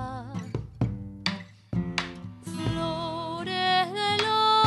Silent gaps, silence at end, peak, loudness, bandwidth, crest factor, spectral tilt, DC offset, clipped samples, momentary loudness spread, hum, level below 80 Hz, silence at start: none; 0 s; -8 dBFS; -28 LUFS; 13 kHz; 20 dB; -5 dB/octave; under 0.1%; under 0.1%; 13 LU; none; -50 dBFS; 0 s